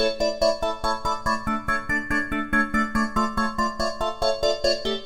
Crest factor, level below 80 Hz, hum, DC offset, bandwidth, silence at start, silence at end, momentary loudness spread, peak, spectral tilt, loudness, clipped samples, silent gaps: 16 dB; -38 dBFS; none; under 0.1%; 17 kHz; 0 s; 0 s; 3 LU; -8 dBFS; -4 dB/octave; -24 LUFS; under 0.1%; none